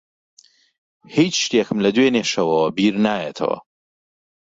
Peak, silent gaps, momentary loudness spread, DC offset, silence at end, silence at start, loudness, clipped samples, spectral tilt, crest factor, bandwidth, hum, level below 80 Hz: -4 dBFS; none; 8 LU; under 0.1%; 0.9 s; 1.1 s; -19 LUFS; under 0.1%; -4.5 dB/octave; 16 dB; 7.8 kHz; none; -60 dBFS